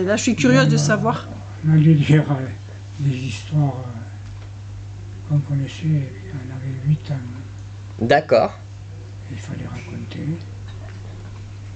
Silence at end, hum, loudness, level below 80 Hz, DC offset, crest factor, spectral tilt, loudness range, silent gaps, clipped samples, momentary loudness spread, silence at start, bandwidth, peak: 0 s; none; -20 LUFS; -46 dBFS; under 0.1%; 18 dB; -6.5 dB/octave; 8 LU; none; under 0.1%; 20 LU; 0 s; 8.6 kHz; -2 dBFS